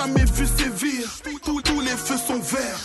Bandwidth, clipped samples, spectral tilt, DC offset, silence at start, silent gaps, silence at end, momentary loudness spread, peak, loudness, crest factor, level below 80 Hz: 12.5 kHz; under 0.1%; -4 dB/octave; under 0.1%; 0 s; none; 0 s; 8 LU; -8 dBFS; -23 LUFS; 14 dB; -28 dBFS